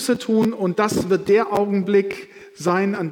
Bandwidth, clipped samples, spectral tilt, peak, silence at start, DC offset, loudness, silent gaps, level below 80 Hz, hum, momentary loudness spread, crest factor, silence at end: 17.5 kHz; under 0.1%; -6 dB/octave; -6 dBFS; 0 s; under 0.1%; -20 LUFS; none; -58 dBFS; none; 6 LU; 14 dB; 0 s